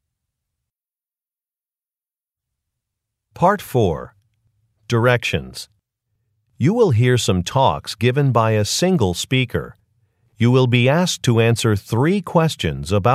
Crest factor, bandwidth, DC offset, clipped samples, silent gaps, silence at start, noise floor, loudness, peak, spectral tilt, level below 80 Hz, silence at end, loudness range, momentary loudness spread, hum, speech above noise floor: 18 dB; 15 kHz; under 0.1%; under 0.1%; none; 3.35 s; under -90 dBFS; -18 LUFS; -2 dBFS; -5.5 dB/octave; -46 dBFS; 0 s; 7 LU; 8 LU; none; over 73 dB